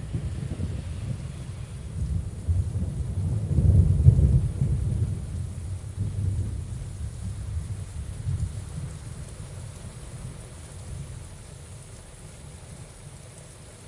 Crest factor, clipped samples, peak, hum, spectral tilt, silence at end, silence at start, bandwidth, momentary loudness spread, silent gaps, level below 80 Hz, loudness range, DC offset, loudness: 26 dB; under 0.1%; -2 dBFS; none; -7.5 dB/octave; 0 s; 0 s; 11.5 kHz; 22 LU; none; -34 dBFS; 17 LU; under 0.1%; -28 LUFS